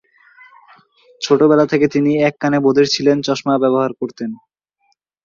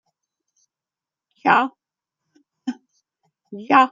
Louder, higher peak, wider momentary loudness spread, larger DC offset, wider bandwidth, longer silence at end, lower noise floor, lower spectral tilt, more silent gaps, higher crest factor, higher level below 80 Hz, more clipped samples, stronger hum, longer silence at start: first, -15 LUFS vs -20 LUFS; about the same, -2 dBFS vs -2 dBFS; second, 14 LU vs 22 LU; neither; about the same, 7.4 kHz vs 7.6 kHz; first, 0.9 s vs 0.05 s; second, -65 dBFS vs -89 dBFS; about the same, -5.5 dB/octave vs -5 dB/octave; neither; second, 14 dB vs 22 dB; first, -60 dBFS vs -76 dBFS; neither; neither; second, 1.2 s vs 1.45 s